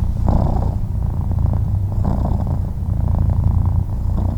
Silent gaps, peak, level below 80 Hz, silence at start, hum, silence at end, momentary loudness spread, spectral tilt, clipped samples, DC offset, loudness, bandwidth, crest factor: none; -2 dBFS; -20 dBFS; 0 s; none; 0 s; 4 LU; -10.5 dB/octave; under 0.1%; under 0.1%; -20 LUFS; 5.2 kHz; 14 dB